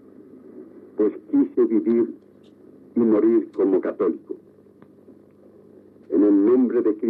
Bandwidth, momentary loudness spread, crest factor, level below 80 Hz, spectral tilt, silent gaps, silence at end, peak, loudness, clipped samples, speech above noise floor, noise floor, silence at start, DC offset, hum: 3 kHz; 12 LU; 12 dB; -78 dBFS; -11 dB/octave; none; 0 s; -10 dBFS; -21 LUFS; under 0.1%; 30 dB; -50 dBFS; 0.55 s; under 0.1%; 50 Hz at -65 dBFS